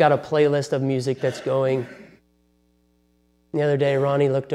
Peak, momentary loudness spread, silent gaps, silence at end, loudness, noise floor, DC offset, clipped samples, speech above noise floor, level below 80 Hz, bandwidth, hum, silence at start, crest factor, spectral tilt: -4 dBFS; 6 LU; none; 0 s; -22 LUFS; -63 dBFS; under 0.1%; under 0.1%; 42 dB; -66 dBFS; 12 kHz; 60 Hz at -60 dBFS; 0 s; 18 dB; -7 dB/octave